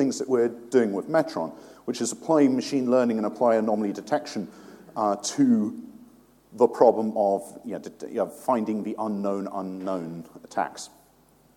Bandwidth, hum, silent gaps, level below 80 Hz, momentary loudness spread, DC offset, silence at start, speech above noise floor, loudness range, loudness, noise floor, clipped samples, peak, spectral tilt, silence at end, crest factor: 16 kHz; none; none; -72 dBFS; 15 LU; under 0.1%; 0 s; 34 dB; 5 LU; -25 LUFS; -59 dBFS; under 0.1%; -4 dBFS; -5.5 dB/octave; 0.7 s; 22 dB